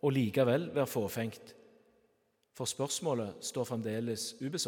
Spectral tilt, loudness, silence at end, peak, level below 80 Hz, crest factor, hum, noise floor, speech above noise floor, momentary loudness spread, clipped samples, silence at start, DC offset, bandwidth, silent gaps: -5 dB/octave; -34 LUFS; 0 s; -16 dBFS; -78 dBFS; 18 dB; none; -75 dBFS; 41 dB; 9 LU; under 0.1%; 0.05 s; under 0.1%; 18 kHz; none